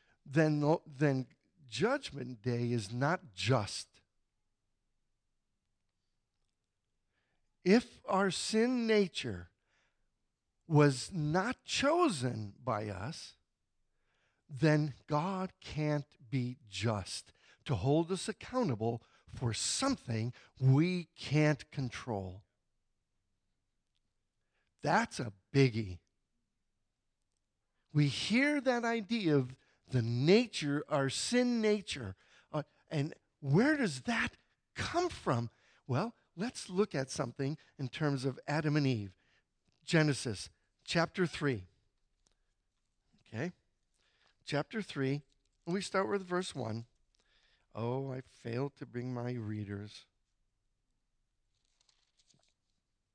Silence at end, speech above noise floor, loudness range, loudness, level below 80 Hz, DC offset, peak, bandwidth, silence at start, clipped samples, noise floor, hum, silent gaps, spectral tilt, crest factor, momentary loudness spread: 3.15 s; 51 dB; 8 LU; -34 LUFS; -68 dBFS; under 0.1%; -14 dBFS; 10.5 kHz; 0.25 s; under 0.1%; -84 dBFS; none; none; -5.5 dB/octave; 22 dB; 13 LU